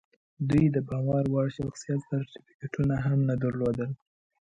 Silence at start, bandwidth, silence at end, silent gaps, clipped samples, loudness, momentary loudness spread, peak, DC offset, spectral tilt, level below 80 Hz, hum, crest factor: 0.4 s; 8 kHz; 0.45 s; 2.54-2.59 s; under 0.1%; -28 LUFS; 12 LU; -14 dBFS; under 0.1%; -8.5 dB/octave; -52 dBFS; none; 14 dB